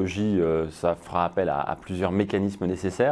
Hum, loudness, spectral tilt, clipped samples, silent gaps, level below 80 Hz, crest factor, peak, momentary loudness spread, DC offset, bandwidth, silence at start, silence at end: none; -26 LUFS; -7 dB/octave; under 0.1%; none; -50 dBFS; 16 dB; -8 dBFS; 5 LU; under 0.1%; 11 kHz; 0 s; 0 s